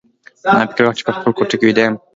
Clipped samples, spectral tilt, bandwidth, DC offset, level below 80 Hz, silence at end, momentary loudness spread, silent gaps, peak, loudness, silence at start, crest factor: under 0.1%; -5.5 dB/octave; 7.8 kHz; under 0.1%; -58 dBFS; 0.2 s; 5 LU; none; 0 dBFS; -15 LUFS; 0.45 s; 16 dB